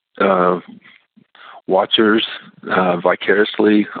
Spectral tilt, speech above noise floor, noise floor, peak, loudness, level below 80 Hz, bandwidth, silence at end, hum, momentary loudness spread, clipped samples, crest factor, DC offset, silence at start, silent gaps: -9.5 dB/octave; 33 dB; -49 dBFS; -2 dBFS; -16 LUFS; -66 dBFS; 4.7 kHz; 0 s; none; 10 LU; under 0.1%; 16 dB; under 0.1%; 0.2 s; none